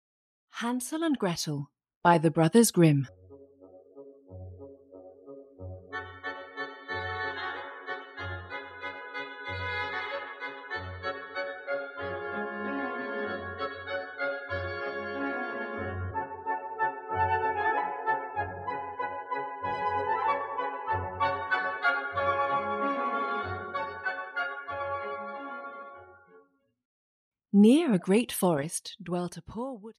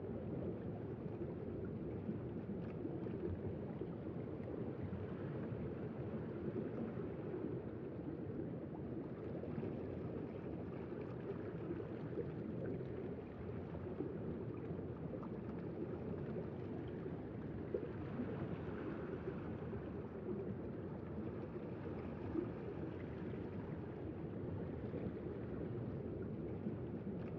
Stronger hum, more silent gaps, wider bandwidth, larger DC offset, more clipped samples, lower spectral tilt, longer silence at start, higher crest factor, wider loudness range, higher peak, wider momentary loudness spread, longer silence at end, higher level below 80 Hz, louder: neither; first, 1.96-2.01 s, 26.85-27.32 s vs none; first, 14.5 kHz vs 5.8 kHz; neither; neither; second, -5 dB/octave vs -9 dB/octave; first, 0.55 s vs 0 s; about the same, 22 dB vs 18 dB; first, 11 LU vs 1 LU; first, -8 dBFS vs -28 dBFS; first, 15 LU vs 3 LU; about the same, 0.05 s vs 0 s; about the same, -64 dBFS vs -64 dBFS; first, -30 LUFS vs -46 LUFS